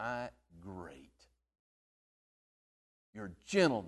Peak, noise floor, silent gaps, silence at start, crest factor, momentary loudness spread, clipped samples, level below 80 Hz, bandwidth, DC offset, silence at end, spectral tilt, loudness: -16 dBFS; -70 dBFS; 1.59-3.13 s; 0 s; 24 dB; 24 LU; under 0.1%; -68 dBFS; 12 kHz; under 0.1%; 0 s; -5 dB/octave; -37 LUFS